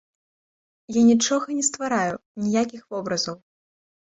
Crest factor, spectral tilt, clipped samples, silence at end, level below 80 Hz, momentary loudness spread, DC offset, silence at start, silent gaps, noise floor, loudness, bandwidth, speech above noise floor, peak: 18 dB; -3.5 dB/octave; under 0.1%; 0.75 s; -64 dBFS; 12 LU; under 0.1%; 0.9 s; 2.26-2.35 s; under -90 dBFS; -23 LUFS; 8 kHz; over 68 dB; -8 dBFS